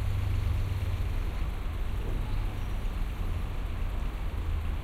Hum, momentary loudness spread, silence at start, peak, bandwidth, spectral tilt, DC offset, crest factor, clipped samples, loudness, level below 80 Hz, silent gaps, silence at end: none; 5 LU; 0 s; -18 dBFS; 15 kHz; -6.5 dB/octave; under 0.1%; 12 dB; under 0.1%; -34 LUFS; -32 dBFS; none; 0 s